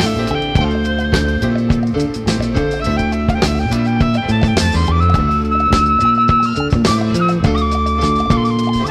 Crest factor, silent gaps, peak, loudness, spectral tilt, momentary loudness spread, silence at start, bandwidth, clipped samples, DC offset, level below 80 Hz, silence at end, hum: 14 dB; none; 0 dBFS; -15 LUFS; -6 dB/octave; 5 LU; 0 s; 13 kHz; under 0.1%; under 0.1%; -24 dBFS; 0 s; none